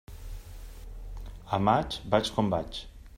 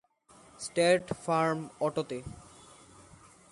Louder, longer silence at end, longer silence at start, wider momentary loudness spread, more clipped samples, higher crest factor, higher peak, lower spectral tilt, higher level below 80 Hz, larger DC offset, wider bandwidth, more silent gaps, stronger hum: about the same, -28 LUFS vs -30 LUFS; second, 0 s vs 1.1 s; second, 0.1 s vs 0.6 s; first, 21 LU vs 16 LU; neither; about the same, 24 dB vs 22 dB; first, -8 dBFS vs -12 dBFS; first, -6 dB/octave vs -4.5 dB/octave; first, -44 dBFS vs -62 dBFS; neither; first, 16 kHz vs 11.5 kHz; neither; neither